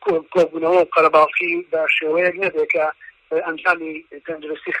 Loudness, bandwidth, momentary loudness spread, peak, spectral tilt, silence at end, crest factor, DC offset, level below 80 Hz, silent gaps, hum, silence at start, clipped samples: -18 LUFS; 9.6 kHz; 14 LU; -2 dBFS; -5.5 dB/octave; 0 s; 18 dB; under 0.1%; -64 dBFS; none; none; 0 s; under 0.1%